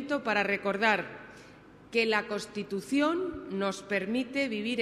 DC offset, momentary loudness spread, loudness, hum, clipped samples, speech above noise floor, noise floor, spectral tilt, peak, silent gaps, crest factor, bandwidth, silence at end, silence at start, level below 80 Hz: under 0.1%; 9 LU; -30 LUFS; none; under 0.1%; 23 dB; -53 dBFS; -4.5 dB/octave; -10 dBFS; none; 20 dB; 13.5 kHz; 0 s; 0 s; -64 dBFS